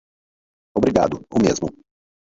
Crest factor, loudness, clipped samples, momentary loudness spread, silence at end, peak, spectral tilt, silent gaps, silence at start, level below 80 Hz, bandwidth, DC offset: 20 dB; -20 LUFS; under 0.1%; 9 LU; 0.6 s; -2 dBFS; -6 dB/octave; none; 0.75 s; -46 dBFS; 7.8 kHz; under 0.1%